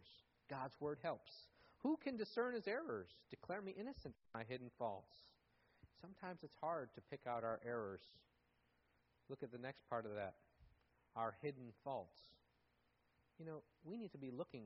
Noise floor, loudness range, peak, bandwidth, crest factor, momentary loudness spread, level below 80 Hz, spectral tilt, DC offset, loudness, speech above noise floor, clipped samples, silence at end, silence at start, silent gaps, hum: -81 dBFS; 6 LU; -30 dBFS; 5.8 kHz; 20 dB; 17 LU; -80 dBFS; -4.5 dB/octave; under 0.1%; -49 LUFS; 33 dB; under 0.1%; 0 s; 0 s; none; none